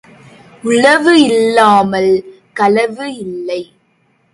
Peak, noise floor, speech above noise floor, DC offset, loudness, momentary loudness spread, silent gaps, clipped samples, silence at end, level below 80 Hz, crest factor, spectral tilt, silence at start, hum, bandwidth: 0 dBFS; -57 dBFS; 46 dB; under 0.1%; -11 LUFS; 15 LU; none; under 0.1%; 0.7 s; -56 dBFS; 12 dB; -4.5 dB/octave; 0.65 s; none; 11.5 kHz